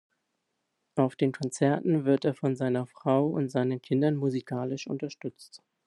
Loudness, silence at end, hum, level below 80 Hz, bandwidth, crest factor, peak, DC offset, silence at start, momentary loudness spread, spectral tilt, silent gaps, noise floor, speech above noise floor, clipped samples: -28 LUFS; 0.3 s; none; -74 dBFS; 11.5 kHz; 18 dB; -10 dBFS; under 0.1%; 0.95 s; 9 LU; -7 dB/octave; none; -80 dBFS; 52 dB; under 0.1%